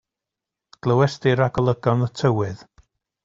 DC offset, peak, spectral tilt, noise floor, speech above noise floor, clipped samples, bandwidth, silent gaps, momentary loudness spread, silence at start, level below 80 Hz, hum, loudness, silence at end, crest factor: under 0.1%; -4 dBFS; -7.5 dB/octave; -86 dBFS; 66 dB; under 0.1%; 7.6 kHz; none; 9 LU; 0.85 s; -50 dBFS; none; -21 LUFS; 0.7 s; 18 dB